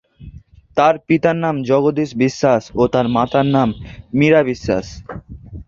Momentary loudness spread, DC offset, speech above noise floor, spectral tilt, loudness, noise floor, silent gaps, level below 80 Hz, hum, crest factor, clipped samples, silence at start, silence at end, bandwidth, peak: 18 LU; under 0.1%; 24 dB; -7 dB/octave; -16 LUFS; -40 dBFS; none; -42 dBFS; none; 16 dB; under 0.1%; 0.2 s; 0.05 s; 7.6 kHz; -2 dBFS